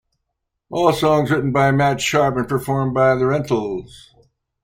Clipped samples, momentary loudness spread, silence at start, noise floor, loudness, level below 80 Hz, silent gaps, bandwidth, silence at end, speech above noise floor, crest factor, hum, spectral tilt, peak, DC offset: under 0.1%; 6 LU; 0.7 s; -77 dBFS; -18 LUFS; -48 dBFS; none; 16.5 kHz; 0.65 s; 59 dB; 16 dB; none; -6 dB/octave; -2 dBFS; under 0.1%